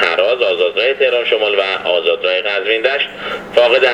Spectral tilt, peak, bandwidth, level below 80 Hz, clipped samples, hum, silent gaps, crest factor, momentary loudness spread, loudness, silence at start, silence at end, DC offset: -3 dB/octave; 0 dBFS; 9.4 kHz; -56 dBFS; under 0.1%; none; none; 14 dB; 4 LU; -14 LUFS; 0 s; 0 s; under 0.1%